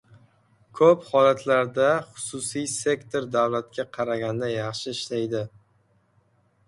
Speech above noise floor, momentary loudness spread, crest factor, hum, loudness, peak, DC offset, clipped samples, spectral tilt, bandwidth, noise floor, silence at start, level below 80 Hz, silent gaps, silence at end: 41 dB; 11 LU; 20 dB; none; -24 LUFS; -6 dBFS; under 0.1%; under 0.1%; -4.5 dB/octave; 11.5 kHz; -65 dBFS; 0.75 s; -66 dBFS; none; 1.2 s